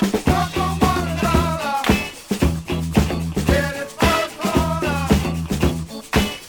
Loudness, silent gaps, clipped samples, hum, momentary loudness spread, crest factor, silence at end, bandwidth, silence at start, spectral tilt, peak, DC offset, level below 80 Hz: -20 LUFS; none; under 0.1%; none; 4 LU; 18 dB; 0 s; over 20 kHz; 0 s; -5.5 dB/octave; -2 dBFS; under 0.1%; -30 dBFS